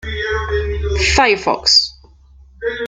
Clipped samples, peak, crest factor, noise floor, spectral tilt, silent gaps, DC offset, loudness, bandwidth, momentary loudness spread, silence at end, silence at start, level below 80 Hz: under 0.1%; 0 dBFS; 16 dB; -45 dBFS; -3 dB/octave; none; under 0.1%; -15 LUFS; 9.4 kHz; 13 LU; 0 s; 0.05 s; -28 dBFS